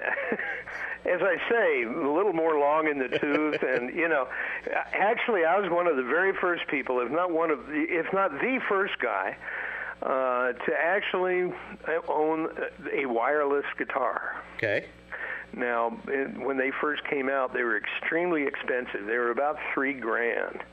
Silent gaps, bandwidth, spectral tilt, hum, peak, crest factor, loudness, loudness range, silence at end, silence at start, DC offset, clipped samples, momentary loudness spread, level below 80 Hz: none; 7.8 kHz; -6.5 dB/octave; none; -10 dBFS; 18 dB; -27 LUFS; 3 LU; 0 s; 0 s; under 0.1%; under 0.1%; 7 LU; -64 dBFS